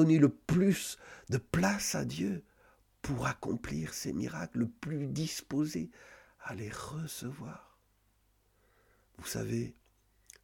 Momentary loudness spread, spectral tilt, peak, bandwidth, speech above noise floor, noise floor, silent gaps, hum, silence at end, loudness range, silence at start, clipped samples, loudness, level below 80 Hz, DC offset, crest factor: 16 LU; -5.5 dB/octave; -12 dBFS; 18 kHz; 38 dB; -72 dBFS; none; none; 0.7 s; 10 LU; 0 s; under 0.1%; -34 LUFS; -58 dBFS; under 0.1%; 22 dB